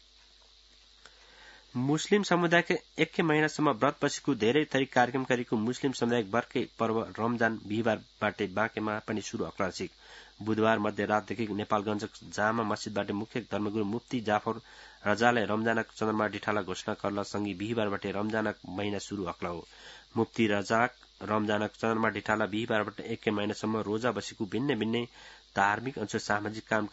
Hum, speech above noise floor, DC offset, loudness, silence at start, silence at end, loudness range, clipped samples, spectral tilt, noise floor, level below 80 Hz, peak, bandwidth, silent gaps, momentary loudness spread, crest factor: none; 29 dB; under 0.1%; -30 LUFS; 1.05 s; 0.05 s; 4 LU; under 0.1%; -5 dB/octave; -59 dBFS; -66 dBFS; -8 dBFS; 8 kHz; none; 9 LU; 24 dB